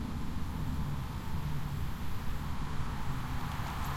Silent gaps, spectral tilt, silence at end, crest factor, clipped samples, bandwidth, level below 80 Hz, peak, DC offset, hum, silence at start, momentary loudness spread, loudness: none; -6 dB/octave; 0 s; 12 dB; under 0.1%; 16 kHz; -40 dBFS; -22 dBFS; under 0.1%; none; 0 s; 2 LU; -39 LUFS